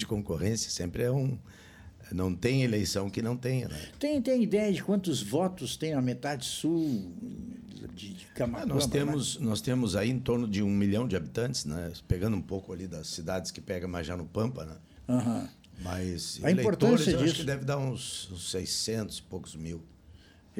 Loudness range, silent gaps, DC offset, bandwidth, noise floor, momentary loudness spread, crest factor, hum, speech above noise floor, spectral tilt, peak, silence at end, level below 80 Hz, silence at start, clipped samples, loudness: 6 LU; none; under 0.1%; 16.5 kHz; -55 dBFS; 14 LU; 18 dB; none; 25 dB; -5.5 dB/octave; -12 dBFS; 0 s; -52 dBFS; 0 s; under 0.1%; -31 LUFS